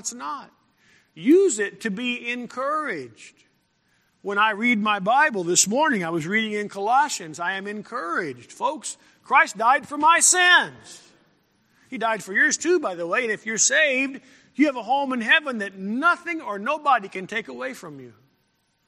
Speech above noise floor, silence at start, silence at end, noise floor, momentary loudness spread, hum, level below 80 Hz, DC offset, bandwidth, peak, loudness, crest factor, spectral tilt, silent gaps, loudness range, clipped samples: 46 dB; 0.05 s; 0.8 s; -69 dBFS; 15 LU; none; -76 dBFS; under 0.1%; 15 kHz; -2 dBFS; -21 LUFS; 22 dB; -2 dB/octave; none; 6 LU; under 0.1%